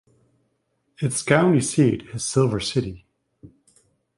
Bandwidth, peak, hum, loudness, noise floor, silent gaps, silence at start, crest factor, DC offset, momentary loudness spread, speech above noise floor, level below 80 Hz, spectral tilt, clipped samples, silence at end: 11.5 kHz; -2 dBFS; none; -21 LUFS; -71 dBFS; none; 1 s; 22 dB; under 0.1%; 9 LU; 51 dB; -52 dBFS; -5 dB/octave; under 0.1%; 0.7 s